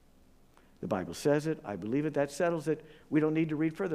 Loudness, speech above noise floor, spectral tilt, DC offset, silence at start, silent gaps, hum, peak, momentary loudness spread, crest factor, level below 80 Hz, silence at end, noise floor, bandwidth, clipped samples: -32 LUFS; 29 dB; -6.5 dB/octave; under 0.1%; 0.8 s; none; none; -14 dBFS; 7 LU; 18 dB; -64 dBFS; 0 s; -60 dBFS; 15 kHz; under 0.1%